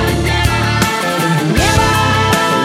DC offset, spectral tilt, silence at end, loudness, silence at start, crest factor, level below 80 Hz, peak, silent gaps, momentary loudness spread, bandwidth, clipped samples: under 0.1%; -4.5 dB/octave; 0 s; -13 LUFS; 0 s; 12 dB; -24 dBFS; 0 dBFS; none; 3 LU; 16.5 kHz; under 0.1%